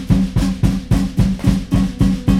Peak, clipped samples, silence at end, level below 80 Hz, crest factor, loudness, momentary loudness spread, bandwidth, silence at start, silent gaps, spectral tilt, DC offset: 0 dBFS; under 0.1%; 0 s; -22 dBFS; 14 dB; -17 LUFS; 2 LU; 14.5 kHz; 0 s; none; -7.5 dB/octave; under 0.1%